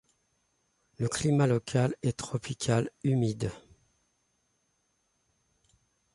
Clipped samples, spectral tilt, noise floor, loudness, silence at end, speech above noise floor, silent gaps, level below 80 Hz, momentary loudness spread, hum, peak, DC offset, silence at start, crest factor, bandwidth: under 0.1%; -6 dB/octave; -75 dBFS; -30 LUFS; 2.55 s; 47 dB; none; -60 dBFS; 9 LU; none; -14 dBFS; under 0.1%; 1 s; 18 dB; 11.5 kHz